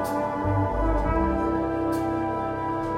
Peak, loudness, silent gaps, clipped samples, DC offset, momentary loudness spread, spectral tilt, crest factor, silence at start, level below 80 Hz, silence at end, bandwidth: -12 dBFS; -26 LUFS; none; under 0.1%; under 0.1%; 4 LU; -8 dB/octave; 14 dB; 0 s; -34 dBFS; 0 s; 16.5 kHz